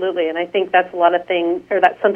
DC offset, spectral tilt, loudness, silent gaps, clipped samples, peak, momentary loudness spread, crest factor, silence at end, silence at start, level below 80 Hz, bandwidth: under 0.1%; -6 dB/octave; -17 LUFS; none; under 0.1%; 0 dBFS; 5 LU; 16 dB; 0 s; 0 s; -64 dBFS; 5.2 kHz